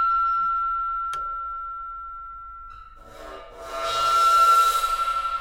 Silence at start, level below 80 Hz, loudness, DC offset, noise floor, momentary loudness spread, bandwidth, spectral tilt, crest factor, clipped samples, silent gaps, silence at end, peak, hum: 0 s; -48 dBFS; -21 LUFS; under 0.1%; -43 dBFS; 24 LU; 16.5 kHz; -0.5 dB/octave; 14 dB; under 0.1%; none; 0 s; -10 dBFS; none